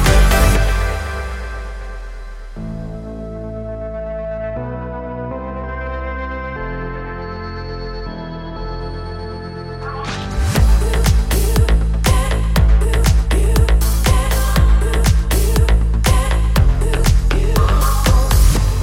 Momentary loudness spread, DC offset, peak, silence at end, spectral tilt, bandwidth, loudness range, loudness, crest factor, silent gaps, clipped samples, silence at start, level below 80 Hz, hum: 14 LU; under 0.1%; 0 dBFS; 0 s; -5 dB/octave; 17 kHz; 12 LU; -18 LUFS; 14 dB; none; under 0.1%; 0 s; -16 dBFS; none